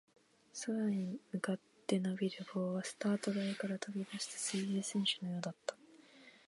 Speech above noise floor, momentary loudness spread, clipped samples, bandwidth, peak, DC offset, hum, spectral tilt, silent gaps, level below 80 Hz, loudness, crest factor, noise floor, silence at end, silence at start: 23 dB; 7 LU; under 0.1%; 11.5 kHz; -20 dBFS; under 0.1%; none; -4.5 dB/octave; none; -88 dBFS; -39 LUFS; 20 dB; -62 dBFS; 0.1 s; 0.55 s